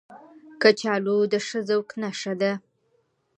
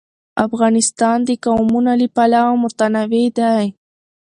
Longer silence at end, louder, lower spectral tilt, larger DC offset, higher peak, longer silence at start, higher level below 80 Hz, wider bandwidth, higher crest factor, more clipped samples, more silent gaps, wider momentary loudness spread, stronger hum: first, 0.8 s vs 0.65 s; second, -24 LUFS vs -15 LUFS; about the same, -4.5 dB/octave vs -4.5 dB/octave; neither; second, -4 dBFS vs 0 dBFS; second, 0.1 s vs 0.35 s; second, -78 dBFS vs -54 dBFS; second, 8.8 kHz vs 11 kHz; first, 22 dB vs 16 dB; neither; neither; first, 10 LU vs 6 LU; neither